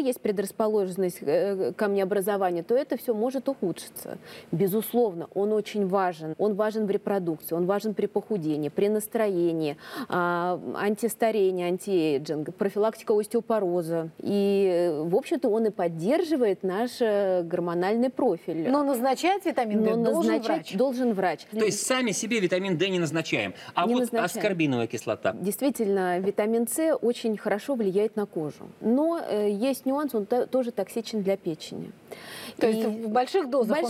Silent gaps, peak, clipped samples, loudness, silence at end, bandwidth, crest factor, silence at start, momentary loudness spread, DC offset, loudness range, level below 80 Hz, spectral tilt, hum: none; -10 dBFS; under 0.1%; -26 LUFS; 0 s; 16 kHz; 16 dB; 0 s; 6 LU; under 0.1%; 3 LU; -76 dBFS; -5.5 dB/octave; none